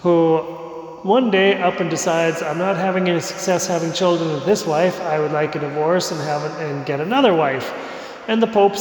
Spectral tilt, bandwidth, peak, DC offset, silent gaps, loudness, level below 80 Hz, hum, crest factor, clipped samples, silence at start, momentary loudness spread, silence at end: -5 dB/octave; 19 kHz; -4 dBFS; under 0.1%; none; -19 LUFS; -62 dBFS; none; 14 dB; under 0.1%; 0 s; 10 LU; 0 s